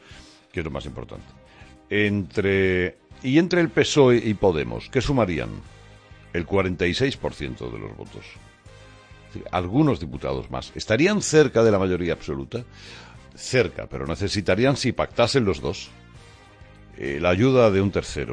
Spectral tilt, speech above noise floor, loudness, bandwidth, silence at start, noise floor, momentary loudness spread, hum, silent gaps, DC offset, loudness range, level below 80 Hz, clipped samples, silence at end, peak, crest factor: -5.5 dB/octave; 25 dB; -22 LUFS; 10.5 kHz; 0.1 s; -48 dBFS; 18 LU; none; none; under 0.1%; 7 LU; -44 dBFS; under 0.1%; 0 s; -4 dBFS; 20 dB